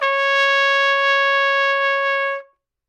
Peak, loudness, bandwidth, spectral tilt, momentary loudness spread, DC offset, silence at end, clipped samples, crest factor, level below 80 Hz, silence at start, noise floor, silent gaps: -6 dBFS; -16 LUFS; 9.4 kHz; 4.5 dB/octave; 6 LU; under 0.1%; 0.45 s; under 0.1%; 12 dB; -82 dBFS; 0 s; -43 dBFS; none